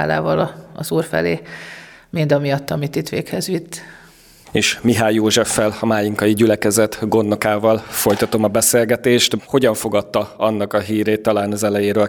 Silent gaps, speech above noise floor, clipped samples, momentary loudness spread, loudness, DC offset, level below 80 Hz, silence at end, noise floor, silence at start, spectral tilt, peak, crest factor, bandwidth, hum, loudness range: none; 28 dB; under 0.1%; 9 LU; -17 LUFS; under 0.1%; -50 dBFS; 0 s; -45 dBFS; 0 s; -4.5 dB/octave; -2 dBFS; 16 dB; 19.5 kHz; none; 5 LU